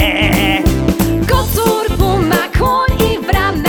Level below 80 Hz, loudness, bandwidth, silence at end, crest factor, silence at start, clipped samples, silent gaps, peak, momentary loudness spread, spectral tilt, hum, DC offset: -20 dBFS; -13 LUFS; over 20 kHz; 0 s; 12 dB; 0 s; under 0.1%; none; 0 dBFS; 3 LU; -5 dB/octave; none; under 0.1%